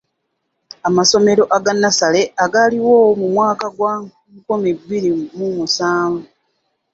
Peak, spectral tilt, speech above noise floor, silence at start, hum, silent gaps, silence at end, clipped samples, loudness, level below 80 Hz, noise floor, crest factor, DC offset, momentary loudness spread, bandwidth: 0 dBFS; -3.5 dB/octave; 57 dB; 0.85 s; none; none; 0.7 s; under 0.1%; -15 LUFS; -58 dBFS; -71 dBFS; 16 dB; under 0.1%; 10 LU; 8 kHz